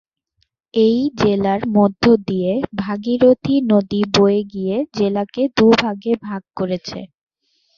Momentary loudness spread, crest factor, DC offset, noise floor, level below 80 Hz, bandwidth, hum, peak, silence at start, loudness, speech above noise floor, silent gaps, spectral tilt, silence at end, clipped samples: 10 LU; 16 dB; under 0.1%; -67 dBFS; -50 dBFS; 7.2 kHz; none; 0 dBFS; 0.75 s; -17 LUFS; 51 dB; none; -6.5 dB/octave; 0.7 s; under 0.1%